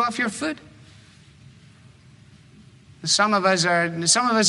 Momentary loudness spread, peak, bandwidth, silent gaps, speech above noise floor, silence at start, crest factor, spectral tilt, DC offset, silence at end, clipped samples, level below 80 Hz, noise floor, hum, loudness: 12 LU; -4 dBFS; 11.5 kHz; none; 29 dB; 0 s; 20 dB; -2.5 dB/octave; under 0.1%; 0 s; under 0.1%; -62 dBFS; -50 dBFS; none; -20 LUFS